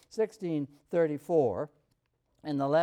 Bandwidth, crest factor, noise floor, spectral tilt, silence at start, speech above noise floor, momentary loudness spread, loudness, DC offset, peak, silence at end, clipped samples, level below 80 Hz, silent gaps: 14 kHz; 16 dB; -75 dBFS; -7.5 dB/octave; 0.15 s; 46 dB; 10 LU; -31 LUFS; under 0.1%; -14 dBFS; 0 s; under 0.1%; -74 dBFS; none